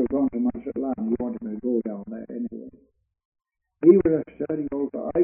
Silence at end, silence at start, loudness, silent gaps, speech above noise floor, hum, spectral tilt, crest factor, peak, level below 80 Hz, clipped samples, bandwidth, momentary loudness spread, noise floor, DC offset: 0 s; 0 s; -24 LUFS; 3.25-3.32 s; 36 dB; none; -12 dB/octave; 22 dB; -4 dBFS; -54 dBFS; under 0.1%; 2.7 kHz; 16 LU; -62 dBFS; under 0.1%